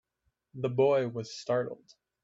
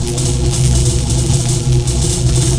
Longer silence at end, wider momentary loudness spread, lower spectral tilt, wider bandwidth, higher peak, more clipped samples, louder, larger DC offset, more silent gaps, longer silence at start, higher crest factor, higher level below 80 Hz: first, 0.5 s vs 0 s; first, 18 LU vs 2 LU; first, -6.5 dB/octave vs -5 dB/octave; second, 7.8 kHz vs 11 kHz; second, -14 dBFS vs 0 dBFS; neither; second, -30 LUFS vs -14 LUFS; second, under 0.1% vs 1%; neither; first, 0.55 s vs 0 s; first, 18 dB vs 12 dB; second, -74 dBFS vs -20 dBFS